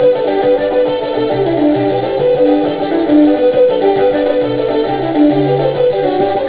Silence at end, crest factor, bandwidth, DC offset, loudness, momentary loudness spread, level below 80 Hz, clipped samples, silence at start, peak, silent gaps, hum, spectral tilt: 0 s; 12 dB; 4 kHz; 0.7%; -12 LUFS; 5 LU; -44 dBFS; under 0.1%; 0 s; 0 dBFS; none; none; -11 dB/octave